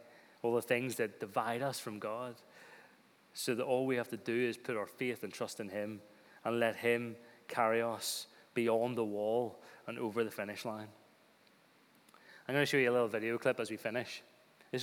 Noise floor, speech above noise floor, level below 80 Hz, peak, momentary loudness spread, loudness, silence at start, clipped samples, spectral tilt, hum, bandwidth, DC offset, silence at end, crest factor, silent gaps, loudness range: -67 dBFS; 31 dB; under -90 dBFS; -18 dBFS; 15 LU; -36 LUFS; 0 s; under 0.1%; -4.5 dB/octave; none; over 20 kHz; under 0.1%; 0 s; 20 dB; none; 3 LU